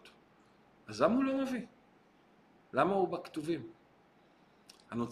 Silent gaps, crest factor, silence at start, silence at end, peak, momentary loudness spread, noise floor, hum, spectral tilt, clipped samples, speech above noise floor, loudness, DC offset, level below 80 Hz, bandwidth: none; 22 dB; 0.05 s; 0 s; -14 dBFS; 16 LU; -65 dBFS; none; -6.5 dB/octave; under 0.1%; 33 dB; -34 LUFS; under 0.1%; -72 dBFS; 13.5 kHz